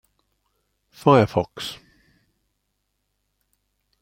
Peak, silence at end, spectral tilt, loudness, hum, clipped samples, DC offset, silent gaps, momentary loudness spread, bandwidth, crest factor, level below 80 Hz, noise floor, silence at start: -2 dBFS; 2.3 s; -7 dB/octave; -20 LUFS; 50 Hz at -55 dBFS; under 0.1%; under 0.1%; none; 17 LU; 16.5 kHz; 24 dB; -60 dBFS; -75 dBFS; 1.05 s